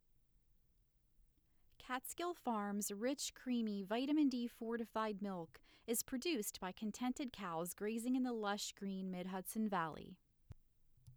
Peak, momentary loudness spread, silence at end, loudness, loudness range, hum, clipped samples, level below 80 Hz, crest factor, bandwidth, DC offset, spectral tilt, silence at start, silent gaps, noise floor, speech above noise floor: -28 dBFS; 7 LU; 0 s; -42 LUFS; 3 LU; none; under 0.1%; -72 dBFS; 16 dB; over 20 kHz; under 0.1%; -4 dB/octave; 1.8 s; none; -76 dBFS; 34 dB